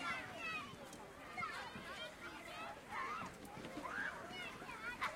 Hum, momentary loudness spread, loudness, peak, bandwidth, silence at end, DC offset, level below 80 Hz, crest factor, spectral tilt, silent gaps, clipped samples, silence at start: none; 7 LU; -47 LUFS; -28 dBFS; 16 kHz; 0 s; under 0.1%; -70 dBFS; 20 dB; -3 dB/octave; none; under 0.1%; 0 s